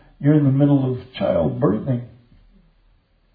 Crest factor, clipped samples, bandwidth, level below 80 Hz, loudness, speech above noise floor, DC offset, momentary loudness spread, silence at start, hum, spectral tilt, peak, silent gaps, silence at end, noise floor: 16 dB; under 0.1%; 4.4 kHz; -52 dBFS; -19 LUFS; 40 dB; under 0.1%; 9 LU; 0.2 s; none; -12.5 dB/octave; -4 dBFS; none; 1.25 s; -58 dBFS